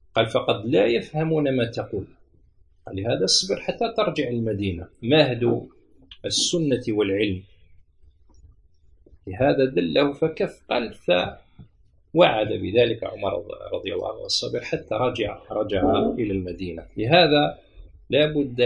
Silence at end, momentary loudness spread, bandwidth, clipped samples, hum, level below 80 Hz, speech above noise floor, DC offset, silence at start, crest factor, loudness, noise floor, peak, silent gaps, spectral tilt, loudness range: 0 s; 12 LU; 11.5 kHz; under 0.1%; none; -50 dBFS; 34 dB; under 0.1%; 0.15 s; 22 dB; -23 LUFS; -57 dBFS; -2 dBFS; none; -4.5 dB/octave; 4 LU